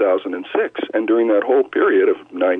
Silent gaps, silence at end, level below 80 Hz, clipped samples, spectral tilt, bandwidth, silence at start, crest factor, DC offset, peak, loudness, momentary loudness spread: none; 0 s; -76 dBFS; under 0.1%; -7 dB/octave; 3.9 kHz; 0 s; 10 dB; under 0.1%; -6 dBFS; -18 LUFS; 6 LU